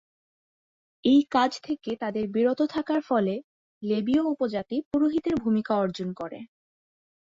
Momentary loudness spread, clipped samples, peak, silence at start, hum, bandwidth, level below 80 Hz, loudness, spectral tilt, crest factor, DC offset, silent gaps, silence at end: 12 LU; under 0.1%; -10 dBFS; 1.05 s; none; 7.6 kHz; -62 dBFS; -26 LUFS; -6.5 dB/octave; 18 dB; under 0.1%; 3.44-3.81 s, 4.85-4.91 s; 0.95 s